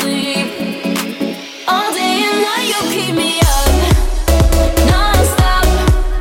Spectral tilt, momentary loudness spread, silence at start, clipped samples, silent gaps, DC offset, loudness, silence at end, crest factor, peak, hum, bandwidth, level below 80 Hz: -4.5 dB/octave; 7 LU; 0 s; under 0.1%; none; under 0.1%; -14 LUFS; 0 s; 12 dB; -2 dBFS; none; 17 kHz; -16 dBFS